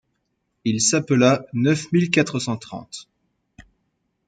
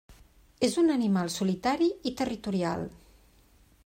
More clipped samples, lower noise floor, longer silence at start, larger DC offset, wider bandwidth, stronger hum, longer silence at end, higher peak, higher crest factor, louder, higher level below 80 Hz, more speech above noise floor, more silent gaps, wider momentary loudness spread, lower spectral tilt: neither; first, -73 dBFS vs -60 dBFS; first, 0.65 s vs 0.1 s; neither; second, 9.6 kHz vs 16 kHz; neither; first, 1.25 s vs 0.95 s; first, -4 dBFS vs -12 dBFS; about the same, 18 dB vs 18 dB; first, -20 LUFS vs -28 LUFS; about the same, -60 dBFS vs -58 dBFS; first, 53 dB vs 33 dB; neither; first, 17 LU vs 8 LU; about the same, -4.5 dB/octave vs -5.5 dB/octave